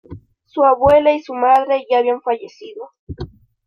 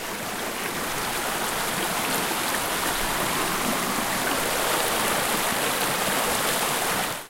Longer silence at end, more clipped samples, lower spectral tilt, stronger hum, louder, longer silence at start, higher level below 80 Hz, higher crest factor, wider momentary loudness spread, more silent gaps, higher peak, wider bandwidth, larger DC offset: first, 0.4 s vs 0 s; neither; first, -7 dB/octave vs -1.5 dB/octave; neither; first, -15 LUFS vs -24 LUFS; about the same, 0.1 s vs 0 s; about the same, -46 dBFS vs -48 dBFS; about the same, 14 dB vs 18 dB; first, 22 LU vs 4 LU; first, 2.99-3.07 s vs none; first, -2 dBFS vs -8 dBFS; second, 6.6 kHz vs 16.5 kHz; neither